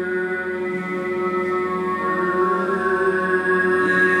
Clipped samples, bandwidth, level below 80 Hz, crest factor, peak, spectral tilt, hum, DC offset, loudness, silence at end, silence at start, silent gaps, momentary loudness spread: under 0.1%; 11 kHz; -64 dBFS; 14 dB; -6 dBFS; -6.5 dB/octave; none; under 0.1%; -20 LUFS; 0 s; 0 s; none; 7 LU